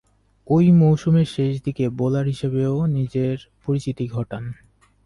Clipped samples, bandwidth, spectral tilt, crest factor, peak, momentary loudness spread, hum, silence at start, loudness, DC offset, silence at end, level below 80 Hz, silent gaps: under 0.1%; 11 kHz; -9 dB/octave; 14 dB; -8 dBFS; 13 LU; none; 0.5 s; -21 LUFS; under 0.1%; 0.55 s; -50 dBFS; none